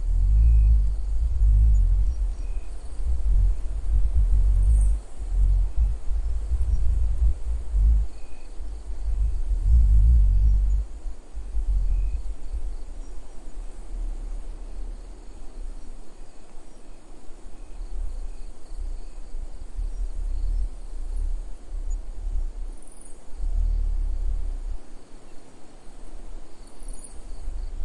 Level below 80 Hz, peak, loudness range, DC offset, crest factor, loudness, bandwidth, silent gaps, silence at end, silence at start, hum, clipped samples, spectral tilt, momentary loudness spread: -24 dBFS; -8 dBFS; 18 LU; under 0.1%; 16 dB; -27 LUFS; 10 kHz; none; 0 s; 0 s; none; under 0.1%; -7 dB/octave; 23 LU